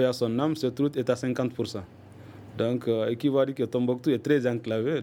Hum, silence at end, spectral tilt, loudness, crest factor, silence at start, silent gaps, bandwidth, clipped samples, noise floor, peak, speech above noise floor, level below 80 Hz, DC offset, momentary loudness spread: none; 0 s; -7 dB/octave; -27 LUFS; 16 dB; 0 s; none; 17 kHz; under 0.1%; -46 dBFS; -10 dBFS; 20 dB; -66 dBFS; under 0.1%; 12 LU